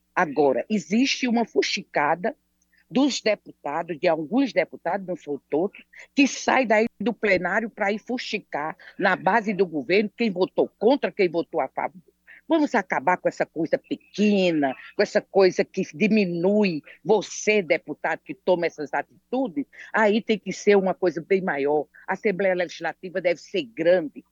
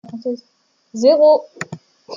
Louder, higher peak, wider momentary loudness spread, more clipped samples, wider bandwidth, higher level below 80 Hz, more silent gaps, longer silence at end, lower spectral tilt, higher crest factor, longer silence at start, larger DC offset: second, -24 LUFS vs -15 LUFS; second, -6 dBFS vs -2 dBFS; second, 9 LU vs 20 LU; neither; about the same, 7.8 kHz vs 7.6 kHz; about the same, -70 dBFS vs -70 dBFS; neither; about the same, 0.1 s vs 0 s; about the same, -5 dB/octave vs -5 dB/octave; about the same, 18 dB vs 16 dB; about the same, 0.15 s vs 0.15 s; neither